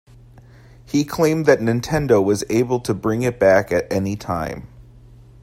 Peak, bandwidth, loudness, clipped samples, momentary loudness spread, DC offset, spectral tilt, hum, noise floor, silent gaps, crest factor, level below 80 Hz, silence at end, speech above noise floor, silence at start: -2 dBFS; 16 kHz; -19 LUFS; under 0.1%; 9 LU; under 0.1%; -6 dB/octave; none; -45 dBFS; none; 18 dB; -46 dBFS; 0.6 s; 27 dB; 0.9 s